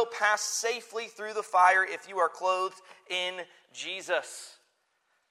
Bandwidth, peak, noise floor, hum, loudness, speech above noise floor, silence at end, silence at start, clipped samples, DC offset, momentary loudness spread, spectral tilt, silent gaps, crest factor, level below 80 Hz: 15.5 kHz; -8 dBFS; -74 dBFS; none; -28 LUFS; 44 dB; 0.8 s; 0 s; under 0.1%; under 0.1%; 19 LU; 0.5 dB/octave; none; 22 dB; under -90 dBFS